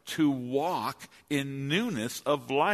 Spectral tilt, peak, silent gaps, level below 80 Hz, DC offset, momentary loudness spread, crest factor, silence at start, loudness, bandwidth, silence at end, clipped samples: -5 dB/octave; -12 dBFS; none; -70 dBFS; under 0.1%; 6 LU; 16 dB; 0.05 s; -30 LUFS; 13.5 kHz; 0 s; under 0.1%